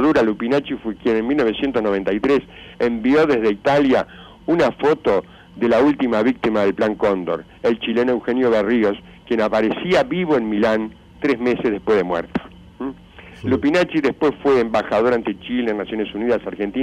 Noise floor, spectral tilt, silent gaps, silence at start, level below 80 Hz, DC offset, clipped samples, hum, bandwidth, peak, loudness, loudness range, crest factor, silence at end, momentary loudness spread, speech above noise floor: -41 dBFS; -6.5 dB/octave; none; 0 s; -48 dBFS; under 0.1%; under 0.1%; none; 10.5 kHz; -8 dBFS; -19 LUFS; 3 LU; 10 dB; 0 s; 8 LU; 23 dB